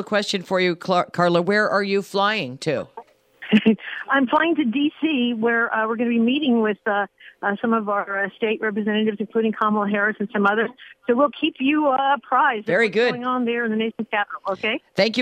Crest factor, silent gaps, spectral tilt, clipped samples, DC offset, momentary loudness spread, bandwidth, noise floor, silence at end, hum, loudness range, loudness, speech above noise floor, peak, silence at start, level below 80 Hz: 16 dB; none; -5.5 dB/octave; under 0.1%; under 0.1%; 6 LU; 9.8 kHz; -43 dBFS; 0 s; none; 2 LU; -21 LUFS; 22 dB; -4 dBFS; 0 s; -70 dBFS